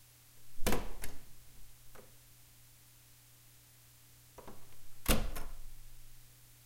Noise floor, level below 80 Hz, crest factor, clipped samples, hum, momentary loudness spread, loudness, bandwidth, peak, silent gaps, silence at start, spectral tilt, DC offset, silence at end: -61 dBFS; -44 dBFS; 24 dB; under 0.1%; none; 24 LU; -39 LUFS; 16.5 kHz; -12 dBFS; none; 0.35 s; -3.5 dB/octave; under 0.1%; 0.4 s